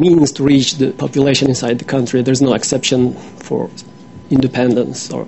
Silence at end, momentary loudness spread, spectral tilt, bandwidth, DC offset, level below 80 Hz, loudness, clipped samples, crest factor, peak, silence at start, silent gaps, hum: 0 s; 10 LU; -5 dB/octave; 8.4 kHz; 0.4%; -46 dBFS; -15 LUFS; under 0.1%; 14 dB; 0 dBFS; 0 s; none; none